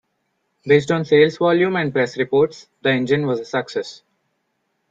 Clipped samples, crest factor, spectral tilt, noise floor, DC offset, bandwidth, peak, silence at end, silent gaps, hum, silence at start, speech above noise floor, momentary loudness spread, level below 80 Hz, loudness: under 0.1%; 18 dB; -6.5 dB/octave; -71 dBFS; under 0.1%; 7.8 kHz; -2 dBFS; 1 s; none; none; 0.65 s; 53 dB; 10 LU; -62 dBFS; -18 LUFS